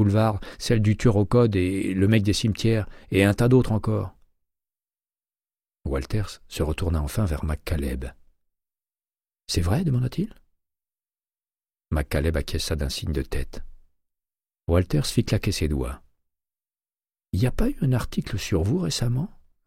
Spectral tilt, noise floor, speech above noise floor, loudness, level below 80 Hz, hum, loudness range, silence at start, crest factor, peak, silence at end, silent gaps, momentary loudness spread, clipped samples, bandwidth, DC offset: -6.5 dB/octave; under -90 dBFS; over 67 dB; -24 LUFS; -36 dBFS; none; 8 LU; 0 s; 18 dB; -6 dBFS; 0.4 s; none; 12 LU; under 0.1%; 16 kHz; under 0.1%